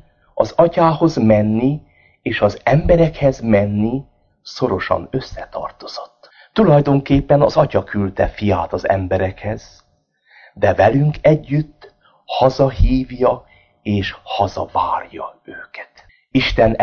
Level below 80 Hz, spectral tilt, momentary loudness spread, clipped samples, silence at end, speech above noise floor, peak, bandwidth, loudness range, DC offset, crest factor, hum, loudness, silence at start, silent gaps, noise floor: -32 dBFS; -8 dB/octave; 17 LU; under 0.1%; 0 s; 43 dB; 0 dBFS; 7 kHz; 5 LU; under 0.1%; 16 dB; none; -17 LUFS; 0.35 s; none; -59 dBFS